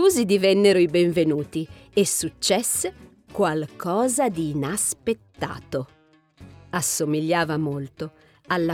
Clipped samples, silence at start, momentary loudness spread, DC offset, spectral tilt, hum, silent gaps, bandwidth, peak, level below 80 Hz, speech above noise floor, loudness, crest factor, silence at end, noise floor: under 0.1%; 0 s; 13 LU; under 0.1%; -4 dB/octave; none; none; 17.5 kHz; -6 dBFS; -56 dBFS; 28 dB; -23 LUFS; 16 dB; 0 s; -50 dBFS